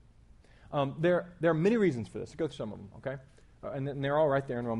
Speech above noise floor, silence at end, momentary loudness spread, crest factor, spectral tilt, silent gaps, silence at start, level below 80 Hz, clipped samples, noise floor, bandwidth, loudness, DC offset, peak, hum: 27 dB; 0 s; 14 LU; 16 dB; -7.5 dB/octave; none; 0.7 s; -60 dBFS; under 0.1%; -58 dBFS; 11 kHz; -31 LUFS; under 0.1%; -14 dBFS; none